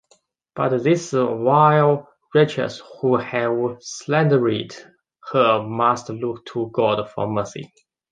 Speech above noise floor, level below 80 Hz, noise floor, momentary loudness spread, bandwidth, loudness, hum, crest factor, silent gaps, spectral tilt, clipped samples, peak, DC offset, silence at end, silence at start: 41 dB; -62 dBFS; -61 dBFS; 12 LU; 9.6 kHz; -20 LUFS; none; 18 dB; none; -6.5 dB/octave; under 0.1%; -2 dBFS; under 0.1%; 0.45 s; 0.55 s